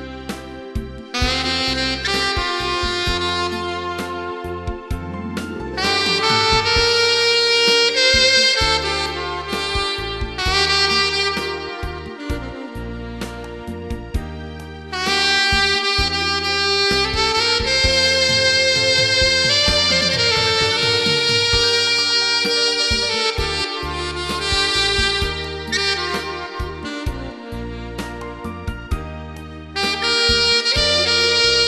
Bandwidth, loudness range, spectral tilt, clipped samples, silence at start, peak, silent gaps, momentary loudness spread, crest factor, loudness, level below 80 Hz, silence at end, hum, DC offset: 13 kHz; 10 LU; -2.5 dB/octave; under 0.1%; 0 s; -2 dBFS; none; 16 LU; 18 dB; -16 LUFS; -34 dBFS; 0 s; none; under 0.1%